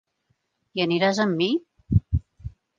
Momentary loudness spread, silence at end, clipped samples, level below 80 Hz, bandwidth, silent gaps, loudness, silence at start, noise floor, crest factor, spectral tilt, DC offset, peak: 13 LU; 0.3 s; under 0.1%; -38 dBFS; 7.6 kHz; none; -24 LUFS; 0.75 s; -72 dBFS; 20 dB; -6.5 dB/octave; under 0.1%; -6 dBFS